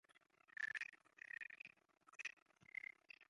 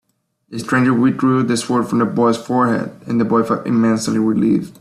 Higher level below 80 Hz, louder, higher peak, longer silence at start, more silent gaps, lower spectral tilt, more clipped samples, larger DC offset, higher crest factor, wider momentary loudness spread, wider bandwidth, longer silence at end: second, under -90 dBFS vs -56 dBFS; second, -52 LUFS vs -16 LUFS; second, -34 dBFS vs -4 dBFS; second, 0.1 s vs 0.5 s; first, 2.33-2.46 s vs none; second, 0 dB/octave vs -6 dB/octave; neither; neither; first, 22 dB vs 14 dB; first, 14 LU vs 5 LU; second, 11 kHz vs 13 kHz; about the same, 0.05 s vs 0.1 s